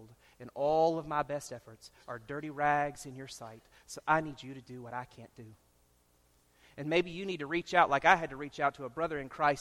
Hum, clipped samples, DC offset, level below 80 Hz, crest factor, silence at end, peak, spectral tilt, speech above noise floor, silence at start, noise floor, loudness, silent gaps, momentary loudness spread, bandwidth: none; under 0.1%; under 0.1%; -64 dBFS; 26 dB; 0 s; -8 dBFS; -5 dB/octave; 35 dB; 0 s; -69 dBFS; -32 LUFS; none; 21 LU; 14 kHz